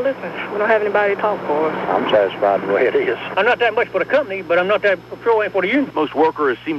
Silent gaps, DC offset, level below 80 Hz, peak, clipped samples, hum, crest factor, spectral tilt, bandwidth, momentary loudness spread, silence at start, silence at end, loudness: none; under 0.1%; -58 dBFS; -4 dBFS; under 0.1%; none; 14 dB; -6.5 dB/octave; 12.5 kHz; 5 LU; 0 s; 0 s; -18 LUFS